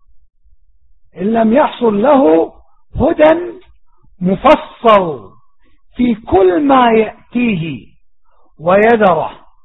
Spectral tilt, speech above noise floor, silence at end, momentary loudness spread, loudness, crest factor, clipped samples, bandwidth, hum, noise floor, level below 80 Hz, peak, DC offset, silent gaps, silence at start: -8.5 dB/octave; 42 dB; 0.3 s; 12 LU; -12 LUFS; 14 dB; under 0.1%; 5.4 kHz; none; -53 dBFS; -40 dBFS; 0 dBFS; 0.6%; none; 1.15 s